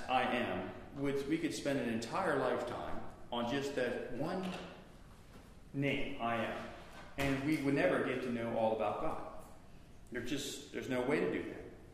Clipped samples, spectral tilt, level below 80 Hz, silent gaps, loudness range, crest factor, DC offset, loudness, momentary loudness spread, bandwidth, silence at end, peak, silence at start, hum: under 0.1%; -5.5 dB/octave; -58 dBFS; none; 4 LU; 20 dB; under 0.1%; -37 LUFS; 16 LU; 15.5 kHz; 0 s; -18 dBFS; 0 s; none